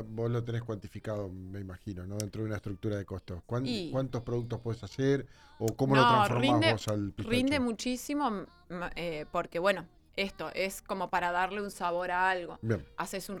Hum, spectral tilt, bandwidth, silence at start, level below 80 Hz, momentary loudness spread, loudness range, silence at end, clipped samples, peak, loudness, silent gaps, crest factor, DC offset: none; -5.5 dB/octave; 18 kHz; 0 s; -54 dBFS; 14 LU; 9 LU; 0 s; under 0.1%; -10 dBFS; -32 LUFS; none; 22 dB; under 0.1%